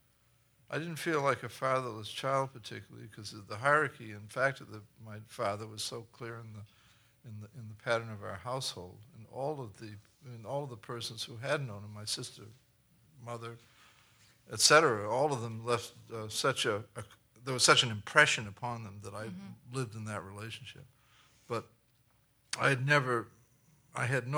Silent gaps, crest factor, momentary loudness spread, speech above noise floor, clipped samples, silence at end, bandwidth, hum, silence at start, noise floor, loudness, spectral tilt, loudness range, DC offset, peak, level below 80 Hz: none; 28 dB; 22 LU; 36 dB; under 0.1%; 0 s; over 20 kHz; none; 0.7 s; -70 dBFS; -32 LUFS; -3 dB/octave; 12 LU; under 0.1%; -8 dBFS; -74 dBFS